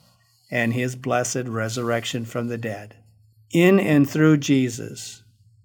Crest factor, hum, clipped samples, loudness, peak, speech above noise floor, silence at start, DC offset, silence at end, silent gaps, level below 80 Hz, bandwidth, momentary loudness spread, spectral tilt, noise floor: 18 dB; none; under 0.1%; -22 LUFS; -4 dBFS; 38 dB; 0.5 s; under 0.1%; 0.5 s; none; -66 dBFS; 18.5 kHz; 15 LU; -5.5 dB/octave; -59 dBFS